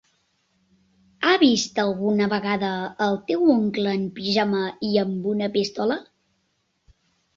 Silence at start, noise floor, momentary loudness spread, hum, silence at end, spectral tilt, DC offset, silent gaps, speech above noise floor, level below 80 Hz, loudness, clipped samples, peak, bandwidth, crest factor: 1.2 s; -71 dBFS; 7 LU; none; 1.35 s; -5 dB/octave; under 0.1%; none; 49 dB; -64 dBFS; -22 LUFS; under 0.1%; -6 dBFS; 7.6 kHz; 18 dB